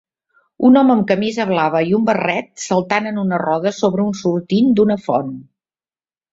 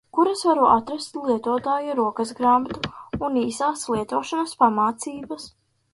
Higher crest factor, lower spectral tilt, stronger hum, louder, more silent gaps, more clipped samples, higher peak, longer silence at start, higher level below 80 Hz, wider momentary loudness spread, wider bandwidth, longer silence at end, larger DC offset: about the same, 16 dB vs 20 dB; first, -6 dB/octave vs -4.5 dB/octave; neither; first, -16 LUFS vs -22 LUFS; neither; neither; about the same, -2 dBFS vs -4 dBFS; first, 0.6 s vs 0.15 s; about the same, -58 dBFS vs -54 dBFS; second, 8 LU vs 13 LU; second, 7.8 kHz vs 11.5 kHz; first, 0.9 s vs 0.45 s; neither